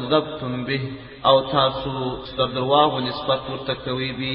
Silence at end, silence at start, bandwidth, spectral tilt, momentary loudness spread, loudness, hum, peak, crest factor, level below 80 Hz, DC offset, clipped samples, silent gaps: 0 s; 0 s; 5.6 kHz; -10.5 dB/octave; 10 LU; -22 LUFS; none; -2 dBFS; 20 dB; -48 dBFS; under 0.1%; under 0.1%; none